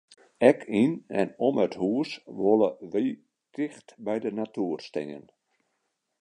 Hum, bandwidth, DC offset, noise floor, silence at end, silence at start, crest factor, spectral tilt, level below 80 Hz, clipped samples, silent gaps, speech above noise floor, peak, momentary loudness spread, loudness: none; 10.5 kHz; under 0.1%; -79 dBFS; 1 s; 0.4 s; 24 dB; -7 dB/octave; -72 dBFS; under 0.1%; none; 52 dB; -4 dBFS; 13 LU; -27 LUFS